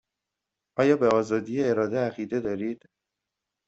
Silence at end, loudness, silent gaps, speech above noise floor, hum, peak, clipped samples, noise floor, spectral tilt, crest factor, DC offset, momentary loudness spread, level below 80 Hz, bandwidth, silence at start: 0.9 s; -26 LUFS; none; 61 dB; none; -8 dBFS; under 0.1%; -86 dBFS; -7 dB/octave; 18 dB; under 0.1%; 12 LU; -66 dBFS; 8 kHz; 0.75 s